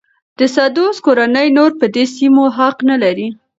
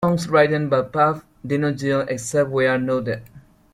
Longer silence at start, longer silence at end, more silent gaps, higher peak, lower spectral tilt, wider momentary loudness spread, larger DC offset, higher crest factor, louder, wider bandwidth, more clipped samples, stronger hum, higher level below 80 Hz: first, 0.4 s vs 0 s; about the same, 0.25 s vs 0.35 s; neither; first, 0 dBFS vs -4 dBFS; second, -4.5 dB/octave vs -6 dB/octave; second, 4 LU vs 9 LU; neither; second, 12 dB vs 18 dB; first, -12 LUFS vs -20 LUFS; second, 7.8 kHz vs 15 kHz; neither; neither; second, -64 dBFS vs -54 dBFS